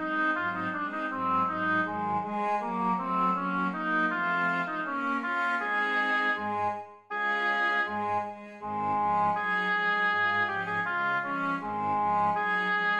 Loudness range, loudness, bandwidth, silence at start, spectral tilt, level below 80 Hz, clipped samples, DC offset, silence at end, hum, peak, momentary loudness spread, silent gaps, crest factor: 2 LU; -28 LUFS; 10.5 kHz; 0 s; -6 dB/octave; -74 dBFS; under 0.1%; under 0.1%; 0 s; none; -16 dBFS; 6 LU; none; 12 dB